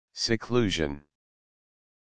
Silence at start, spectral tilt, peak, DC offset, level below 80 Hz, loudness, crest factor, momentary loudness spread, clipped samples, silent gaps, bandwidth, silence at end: 0.1 s; -4.5 dB/octave; -10 dBFS; under 0.1%; -52 dBFS; -28 LUFS; 22 dB; 9 LU; under 0.1%; none; 9.8 kHz; 0.95 s